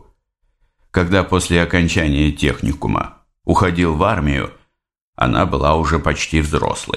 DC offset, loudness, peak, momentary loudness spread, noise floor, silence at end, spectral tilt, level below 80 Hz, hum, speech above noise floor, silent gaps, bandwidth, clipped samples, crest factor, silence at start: under 0.1%; -17 LUFS; 0 dBFS; 6 LU; -65 dBFS; 0 s; -5.5 dB/octave; -28 dBFS; none; 49 dB; 5.01-5.13 s; 13 kHz; under 0.1%; 18 dB; 0.95 s